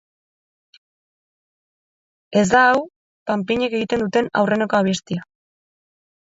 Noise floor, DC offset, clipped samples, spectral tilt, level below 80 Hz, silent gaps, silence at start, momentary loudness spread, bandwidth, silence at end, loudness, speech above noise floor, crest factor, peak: under -90 dBFS; under 0.1%; under 0.1%; -5 dB/octave; -58 dBFS; 2.96-3.26 s; 2.3 s; 15 LU; 8 kHz; 1 s; -19 LUFS; over 72 dB; 18 dB; -4 dBFS